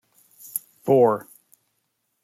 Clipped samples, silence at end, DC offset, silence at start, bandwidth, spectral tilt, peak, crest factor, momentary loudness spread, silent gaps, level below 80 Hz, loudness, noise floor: under 0.1%; 1.05 s; under 0.1%; 0.55 s; 16.5 kHz; -6.5 dB/octave; -4 dBFS; 22 dB; 14 LU; none; -70 dBFS; -22 LUFS; -74 dBFS